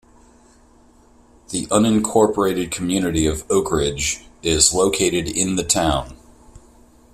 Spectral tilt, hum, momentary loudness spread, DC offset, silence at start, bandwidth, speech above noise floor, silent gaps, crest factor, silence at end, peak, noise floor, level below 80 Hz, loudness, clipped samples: -3.5 dB/octave; none; 9 LU; under 0.1%; 1.5 s; 16 kHz; 33 dB; none; 20 dB; 0.55 s; 0 dBFS; -51 dBFS; -40 dBFS; -19 LUFS; under 0.1%